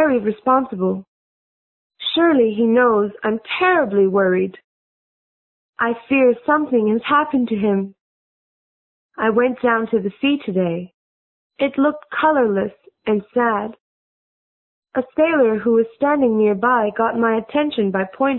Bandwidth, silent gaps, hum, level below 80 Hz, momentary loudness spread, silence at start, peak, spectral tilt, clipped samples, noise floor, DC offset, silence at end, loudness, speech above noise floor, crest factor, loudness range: 4.2 kHz; 1.08-1.90 s, 4.64-5.73 s, 8.01-9.09 s, 10.94-11.50 s, 13.80-14.82 s; none; -60 dBFS; 8 LU; 0 s; -2 dBFS; -11 dB/octave; under 0.1%; under -90 dBFS; under 0.1%; 0 s; -18 LUFS; over 73 dB; 16 dB; 4 LU